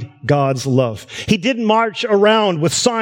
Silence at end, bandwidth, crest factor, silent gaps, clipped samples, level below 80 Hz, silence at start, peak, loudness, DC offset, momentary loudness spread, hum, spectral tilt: 0 s; 16.5 kHz; 14 dB; none; under 0.1%; -50 dBFS; 0 s; 0 dBFS; -16 LUFS; under 0.1%; 6 LU; none; -4.5 dB/octave